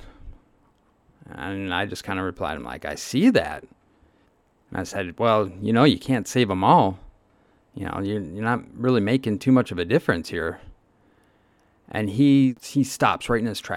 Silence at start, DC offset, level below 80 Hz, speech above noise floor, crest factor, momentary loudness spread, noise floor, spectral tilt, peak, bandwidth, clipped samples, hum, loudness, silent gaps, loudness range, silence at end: 0 s; under 0.1%; -52 dBFS; 40 dB; 20 dB; 14 LU; -62 dBFS; -6 dB/octave; -4 dBFS; 15 kHz; under 0.1%; none; -23 LUFS; none; 4 LU; 0 s